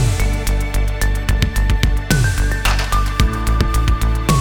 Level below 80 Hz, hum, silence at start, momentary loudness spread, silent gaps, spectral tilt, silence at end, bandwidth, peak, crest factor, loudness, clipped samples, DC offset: -18 dBFS; none; 0 s; 3 LU; none; -4.5 dB/octave; 0 s; 19 kHz; -2 dBFS; 14 dB; -18 LUFS; under 0.1%; 0.6%